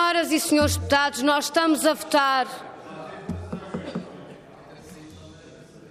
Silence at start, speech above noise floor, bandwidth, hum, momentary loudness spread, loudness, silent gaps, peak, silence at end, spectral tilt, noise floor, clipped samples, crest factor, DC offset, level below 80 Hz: 0 s; 25 dB; 15.5 kHz; none; 23 LU; -22 LUFS; none; -8 dBFS; 0 s; -3.5 dB/octave; -46 dBFS; under 0.1%; 16 dB; under 0.1%; -56 dBFS